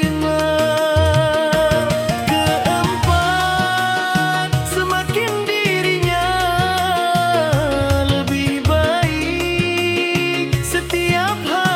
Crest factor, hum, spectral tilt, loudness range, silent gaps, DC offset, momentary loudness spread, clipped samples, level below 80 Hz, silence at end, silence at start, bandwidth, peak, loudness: 16 dB; none; -5 dB/octave; 1 LU; none; under 0.1%; 3 LU; under 0.1%; -34 dBFS; 0 s; 0 s; 17.5 kHz; -2 dBFS; -17 LUFS